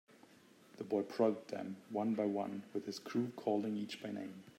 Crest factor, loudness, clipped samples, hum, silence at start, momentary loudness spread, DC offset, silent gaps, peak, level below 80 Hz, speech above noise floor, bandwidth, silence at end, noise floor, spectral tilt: 20 dB; -39 LUFS; under 0.1%; none; 0.15 s; 10 LU; under 0.1%; none; -20 dBFS; -90 dBFS; 25 dB; 16 kHz; 0.05 s; -64 dBFS; -6.5 dB/octave